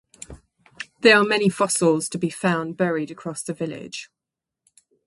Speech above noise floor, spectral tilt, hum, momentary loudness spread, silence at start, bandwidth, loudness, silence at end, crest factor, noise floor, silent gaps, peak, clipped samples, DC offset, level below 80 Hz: 65 dB; -4 dB/octave; none; 22 LU; 0.3 s; 11.5 kHz; -21 LUFS; 1.05 s; 22 dB; -87 dBFS; none; -2 dBFS; under 0.1%; under 0.1%; -60 dBFS